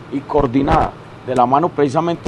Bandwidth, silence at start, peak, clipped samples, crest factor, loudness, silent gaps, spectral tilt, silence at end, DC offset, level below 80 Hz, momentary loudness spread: 11 kHz; 0 s; 0 dBFS; under 0.1%; 16 dB; -16 LUFS; none; -7.5 dB/octave; 0 s; under 0.1%; -32 dBFS; 7 LU